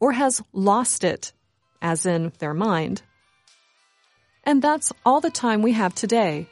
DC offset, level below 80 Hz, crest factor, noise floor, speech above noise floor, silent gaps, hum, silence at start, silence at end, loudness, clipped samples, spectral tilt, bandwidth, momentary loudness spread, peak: under 0.1%; -66 dBFS; 18 dB; -63 dBFS; 42 dB; none; none; 0 s; 0.05 s; -22 LUFS; under 0.1%; -4.5 dB/octave; 11.5 kHz; 10 LU; -6 dBFS